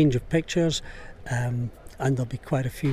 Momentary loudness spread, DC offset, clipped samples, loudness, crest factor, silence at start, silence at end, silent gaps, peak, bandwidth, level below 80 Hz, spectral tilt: 10 LU; under 0.1%; under 0.1%; -27 LUFS; 14 dB; 0 s; 0 s; none; -12 dBFS; 15 kHz; -44 dBFS; -6 dB/octave